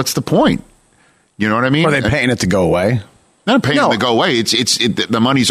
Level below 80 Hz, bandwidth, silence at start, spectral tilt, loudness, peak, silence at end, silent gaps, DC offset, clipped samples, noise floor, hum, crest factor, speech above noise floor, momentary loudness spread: -42 dBFS; 15 kHz; 0 s; -4.5 dB/octave; -14 LUFS; -4 dBFS; 0 s; none; under 0.1%; under 0.1%; -54 dBFS; none; 12 dB; 40 dB; 5 LU